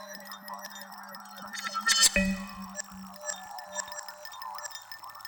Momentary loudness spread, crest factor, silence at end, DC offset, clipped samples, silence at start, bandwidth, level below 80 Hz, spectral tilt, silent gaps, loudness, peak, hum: 21 LU; 24 dB; 0 s; under 0.1%; under 0.1%; 0 s; over 20 kHz; -52 dBFS; -1.5 dB/octave; none; -29 LUFS; -10 dBFS; none